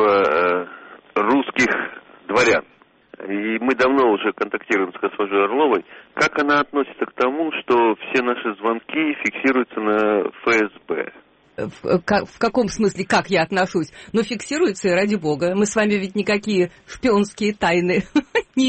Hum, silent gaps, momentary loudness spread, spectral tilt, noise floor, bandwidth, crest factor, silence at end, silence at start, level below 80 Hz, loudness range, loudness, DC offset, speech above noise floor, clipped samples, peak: none; none; 8 LU; -5 dB/octave; -54 dBFS; 8.8 kHz; 14 dB; 0 s; 0 s; -54 dBFS; 2 LU; -20 LUFS; under 0.1%; 34 dB; under 0.1%; -6 dBFS